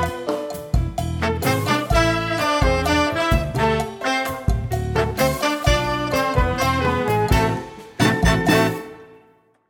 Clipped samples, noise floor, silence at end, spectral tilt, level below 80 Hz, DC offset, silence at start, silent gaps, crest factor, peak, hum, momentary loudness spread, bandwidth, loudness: under 0.1%; -56 dBFS; 0.55 s; -5 dB/octave; -28 dBFS; under 0.1%; 0 s; none; 18 dB; -2 dBFS; none; 6 LU; 17.5 kHz; -20 LUFS